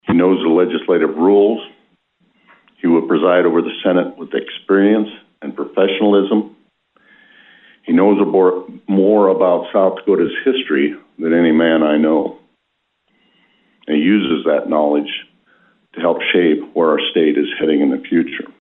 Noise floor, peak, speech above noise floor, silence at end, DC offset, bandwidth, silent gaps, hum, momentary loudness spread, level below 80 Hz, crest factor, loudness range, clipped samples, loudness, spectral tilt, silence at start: -70 dBFS; -2 dBFS; 55 dB; 0.15 s; under 0.1%; 4 kHz; none; none; 11 LU; -62 dBFS; 14 dB; 4 LU; under 0.1%; -15 LUFS; -10 dB/octave; 0.05 s